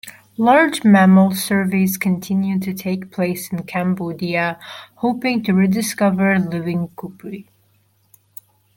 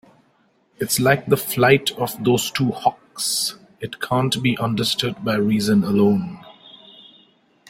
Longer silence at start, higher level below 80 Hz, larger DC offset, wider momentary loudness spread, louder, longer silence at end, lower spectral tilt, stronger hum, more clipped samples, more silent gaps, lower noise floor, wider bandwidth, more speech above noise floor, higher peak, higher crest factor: second, 0.05 s vs 0.8 s; about the same, -60 dBFS vs -56 dBFS; neither; first, 18 LU vs 10 LU; first, -17 LUFS vs -20 LUFS; first, 1.35 s vs 0.95 s; first, -6 dB/octave vs -4.5 dB/octave; neither; neither; neither; about the same, -60 dBFS vs -61 dBFS; about the same, 17 kHz vs 16.5 kHz; about the same, 42 dB vs 42 dB; about the same, -2 dBFS vs -2 dBFS; about the same, 16 dB vs 20 dB